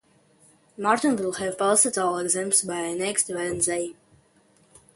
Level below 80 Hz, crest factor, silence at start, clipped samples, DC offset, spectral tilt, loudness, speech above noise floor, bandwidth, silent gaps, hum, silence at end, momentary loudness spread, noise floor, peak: -64 dBFS; 20 dB; 0.8 s; under 0.1%; under 0.1%; -2.5 dB/octave; -23 LUFS; 36 dB; 12 kHz; none; none; 1.05 s; 9 LU; -61 dBFS; -6 dBFS